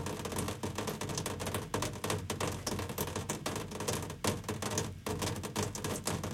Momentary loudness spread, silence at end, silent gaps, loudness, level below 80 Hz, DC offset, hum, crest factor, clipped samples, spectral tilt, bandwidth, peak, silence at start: 2 LU; 0 s; none; -37 LUFS; -56 dBFS; under 0.1%; none; 20 dB; under 0.1%; -4 dB/octave; 17 kHz; -18 dBFS; 0 s